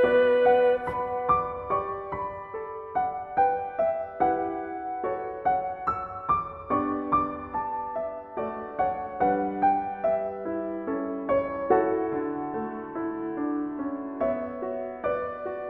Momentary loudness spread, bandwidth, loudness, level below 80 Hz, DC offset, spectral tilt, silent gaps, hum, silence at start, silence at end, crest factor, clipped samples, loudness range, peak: 9 LU; 4.3 kHz; -28 LUFS; -56 dBFS; under 0.1%; -8.5 dB/octave; none; none; 0 s; 0 s; 18 dB; under 0.1%; 2 LU; -8 dBFS